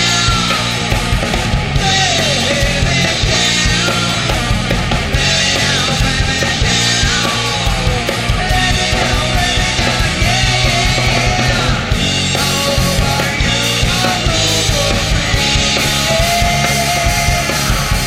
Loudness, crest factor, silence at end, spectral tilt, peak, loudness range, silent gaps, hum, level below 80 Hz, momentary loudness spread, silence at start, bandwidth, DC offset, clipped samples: -13 LUFS; 12 dB; 0 s; -3 dB/octave; 0 dBFS; 1 LU; none; none; -22 dBFS; 4 LU; 0 s; 16.5 kHz; under 0.1%; under 0.1%